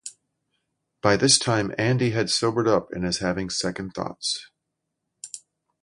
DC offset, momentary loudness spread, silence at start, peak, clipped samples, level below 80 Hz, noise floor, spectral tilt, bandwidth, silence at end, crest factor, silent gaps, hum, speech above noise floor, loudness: under 0.1%; 21 LU; 0.05 s; 0 dBFS; under 0.1%; -54 dBFS; -81 dBFS; -3.5 dB/octave; 11.5 kHz; 0.45 s; 24 dB; none; none; 57 dB; -23 LUFS